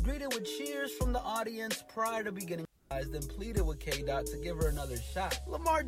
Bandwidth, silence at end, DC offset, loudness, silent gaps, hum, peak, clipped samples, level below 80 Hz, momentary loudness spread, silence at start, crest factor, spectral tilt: 16.5 kHz; 0 s; under 0.1%; -36 LUFS; none; none; -18 dBFS; under 0.1%; -40 dBFS; 6 LU; 0 s; 16 dB; -4.5 dB/octave